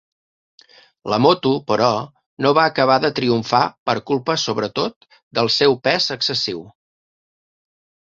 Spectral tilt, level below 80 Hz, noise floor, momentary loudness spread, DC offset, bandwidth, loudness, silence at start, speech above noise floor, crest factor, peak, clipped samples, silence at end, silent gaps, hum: -4.5 dB/octave; -58 dBFS; under -90 dBFS; 10 LU; under 0.1%; 7.8 kHz; -18 LUFS; 1.05 s; over 72 dB; 18 dB; -2 dBFS; under 0.1%; 1.3 s; 2.26-2.37 s, 3.78-3.86 s, 4.96-5.01 s, 5.23-5.31 s; none